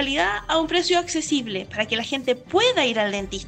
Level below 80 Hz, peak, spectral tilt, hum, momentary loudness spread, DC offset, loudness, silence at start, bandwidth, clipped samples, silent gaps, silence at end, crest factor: -48 dBFS; -8 dBFS; -3 dB/octave; none; 6 LU; under 0.1%; -22 LUFS; 0 s; 9.4 kHz; under 0.1%; none; 0 s; 14 dB